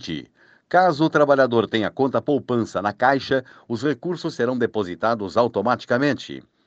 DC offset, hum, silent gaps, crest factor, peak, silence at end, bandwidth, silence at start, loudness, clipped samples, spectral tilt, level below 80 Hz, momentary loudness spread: under 0.1%; none; none; 18 dB; -4 dBFS; 0.25 s; 8.2 kHz; 0 s; -21 LUFS; under 0.1%; -6.5 dB/octave; -60 dBFS; 9 LU